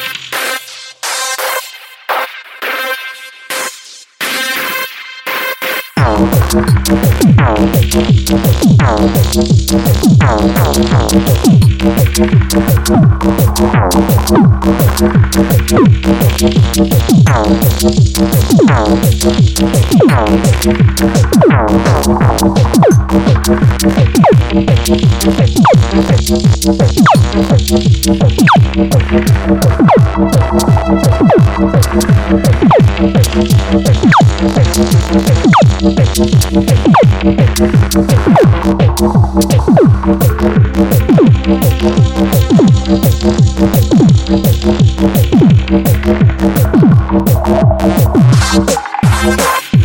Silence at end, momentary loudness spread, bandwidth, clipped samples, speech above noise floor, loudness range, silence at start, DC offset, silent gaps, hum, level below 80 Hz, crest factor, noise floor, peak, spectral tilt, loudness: 0 s; 7 LU; 17 kHz; under 0.1%; 25 dB; 2 LU; 0 s; under 0.1%; none; none; -18 dBFS; 8 dB; -33 dBFS; 0 dBFS; -6 dB/octave; -9 LUFS